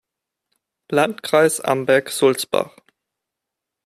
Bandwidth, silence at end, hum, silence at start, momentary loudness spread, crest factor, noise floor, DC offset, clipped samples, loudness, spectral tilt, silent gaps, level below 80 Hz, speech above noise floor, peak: 15 kHz; 1.2 s; none; 0.9 s; 7 LU; 18 dB; -83 dBFS; under 0.1%; under 0.1%; -18 LUFS; -3.5 dB/octave; none; -66 dBFS; 65 dB; -2 dBFS